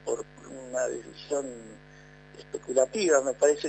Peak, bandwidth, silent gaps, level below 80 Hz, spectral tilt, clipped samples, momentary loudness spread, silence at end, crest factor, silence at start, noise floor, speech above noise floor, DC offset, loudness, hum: -8 dBFS; 9.2 kHz; none; -62 dBFS; -3 dB/octave; under 0.1%; 21 LU; 0 s; 20 dB; 0.05 s; -51 dBFS; 24 dB; under 0.1%; -28 LUFS; 50 Hz at -55 dBFS